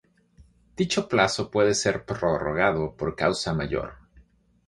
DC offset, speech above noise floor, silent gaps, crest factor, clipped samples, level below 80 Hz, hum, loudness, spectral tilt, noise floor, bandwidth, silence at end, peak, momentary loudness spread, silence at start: under 0.1%; 33 dB; none; 22 dB; under 0.1%; -48 dBFS; none; -25 LUFS; -4.5 dB/octave; -58 dBFS; 11.5 kHz; 0.45 s; -4 dBFS; 8 LU; 0.4 s